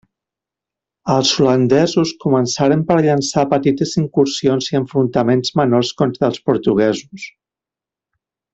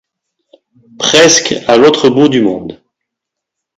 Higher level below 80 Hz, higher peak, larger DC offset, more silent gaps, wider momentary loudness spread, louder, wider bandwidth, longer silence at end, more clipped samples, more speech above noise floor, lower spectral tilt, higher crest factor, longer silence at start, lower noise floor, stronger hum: about the same, -54 dBFS vs -50 dBFS; about the same, 0 dBFS vs 0 dBFS; neither; neither; second, 5 LU vs 11 LU; second, -16 LUFS vs -8 LUFS; second, 8.2 kHz vs 16 kHz; first, 1.25 s vs 1.05 s; second, under 0.1% vs 0.4%; about the same, 72 dB vs 70 dB; first, -5.5 dB/octave vs -3 dB/octave; about the same, 16 dB vs 12 dB; about the same, 1.05 s vs 1 s; first, -88 dBFS vs -78 dBFS; neither